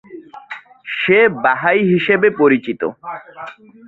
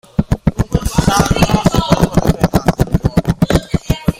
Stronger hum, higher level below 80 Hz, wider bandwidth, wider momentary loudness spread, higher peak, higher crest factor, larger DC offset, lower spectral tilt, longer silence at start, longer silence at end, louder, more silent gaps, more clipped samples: neither; second, -60 dBFS vs -24 dBFS; second, 4.4 kHz vs 16.5 kHz; first, 21 LU vs 5 LU; about the same, -2 dBFS vs 0 dBFS; about the same, 16 dB vs 12 dB; neither; first, -8.5 dB/octave vs -6 dB/octave; about the same, 0.1 s vs 0.2 s; first, 0.35 s vs 0.05 s; about the same, -14 LUFS vs -14 LUFS; neither; neither